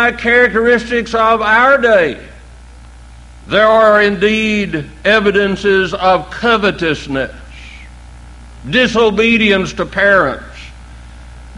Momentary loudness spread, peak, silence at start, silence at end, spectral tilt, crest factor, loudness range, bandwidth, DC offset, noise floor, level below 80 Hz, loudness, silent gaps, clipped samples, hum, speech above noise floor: 12 LU; 0 dBFS; 0 s; 0 s; -5 dB/octave; 14 dB; 4 LU; 11.5 kHz; under 0.1%; -36 dBFS; -36 dBFS; -12 LUFS; none; under 0.1%; none; 24 dB